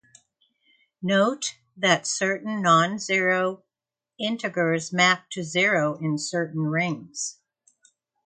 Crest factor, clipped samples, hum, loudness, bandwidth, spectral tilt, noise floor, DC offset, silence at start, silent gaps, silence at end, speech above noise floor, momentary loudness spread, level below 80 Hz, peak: 20 dB; under 0.1%; none; -24 LUFS; 9.6 kHz; -3.5 dB/octave; -90 dBFS; under 0.1%; 1 s; none; 0.95 s; 66 dB; 11 LU; -72 dBFS; -4 dBFS